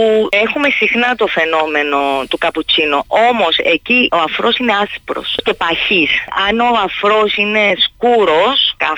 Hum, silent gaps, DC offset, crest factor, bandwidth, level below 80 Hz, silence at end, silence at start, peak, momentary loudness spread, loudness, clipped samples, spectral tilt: none; none; under 0.1%; 12 dB; 19 kHz; -46 dBFS; 0 s; 0 s; -2 dBFS; 5 LU; -12 LUFS; under 0.1%; -4 dB/octave